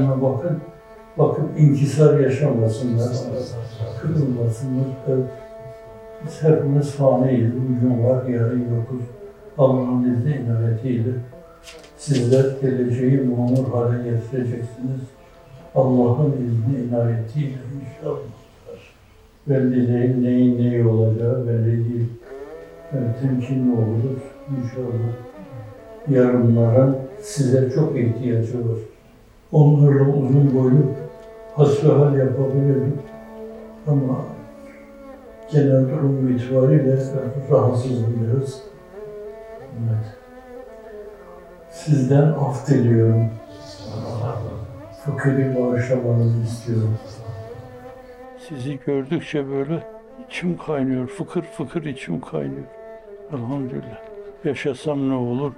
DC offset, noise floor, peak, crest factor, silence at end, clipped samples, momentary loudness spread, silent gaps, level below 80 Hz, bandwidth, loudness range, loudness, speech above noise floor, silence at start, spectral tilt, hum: under 0.1%; -50 dBFS; -2 dBFS; 18 dB; 0.05 s; under 0.1%; 22 LU; none; -54 dBFS; 11 kHz; 9 LU; -20 LUFS; 31 dB; 0 s; -9 dB/octave; none